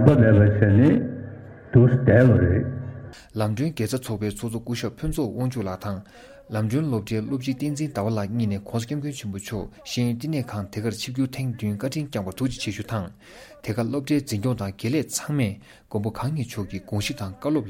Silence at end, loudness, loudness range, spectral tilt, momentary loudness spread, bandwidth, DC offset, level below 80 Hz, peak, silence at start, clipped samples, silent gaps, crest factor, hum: 0 s; -24 LUFS; 8 LU; -7 dB/octave; 15 LU; 16.5 kHz; under 0.1%; -46 dBFS; 0 dBFS; 0 s; under 0.1%; none; 22 dB; none